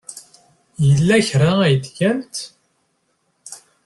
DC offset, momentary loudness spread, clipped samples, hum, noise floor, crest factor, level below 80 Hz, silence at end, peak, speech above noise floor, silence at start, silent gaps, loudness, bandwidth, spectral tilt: under 0.1%; 23 LU; under 0.1%; none; -67 dBFS; 16 dB; -50 dBFS; 0.3 s; -2 dBFS; 51 dB; 0.1 s; none; -17 LUFS; 12 kHz; -6 dB/octave